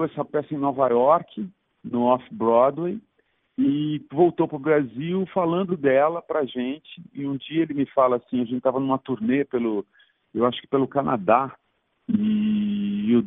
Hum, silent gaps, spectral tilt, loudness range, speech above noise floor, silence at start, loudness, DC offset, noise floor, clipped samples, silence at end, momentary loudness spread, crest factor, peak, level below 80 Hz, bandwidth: none; none; -11.5 dB/octave; 2 LU; 46 dB; 0 s; -23 LUFS; under 0.1%; -69 dBFS; under 0.1%; 0 s; 11 LU; 18 dB; -4 dBFS; -64 dBFS; 3.9 kHz